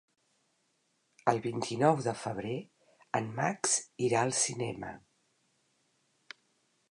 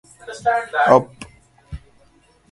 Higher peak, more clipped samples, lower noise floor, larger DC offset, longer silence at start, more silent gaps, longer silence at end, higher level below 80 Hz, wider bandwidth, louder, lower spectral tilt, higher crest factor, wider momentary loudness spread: second, -10 dBFS vs 0 dBFS; neither; first, -76 dBFS vs -55 dBFS; neither; first, 1.25 s vs 0.25 s; neither; first, 1.95 s vs 0.75 s; second, -72 dBFS vs -46 dBFS; about the same, 11 kHz vs 11.5 kHz; second, -32 LUFS vs -17 LUFS; second, -4 dB/octave vs -5.5 dB/octave; about the same, 24 dB vs 22 dB; second, 17 LU vs 25 LU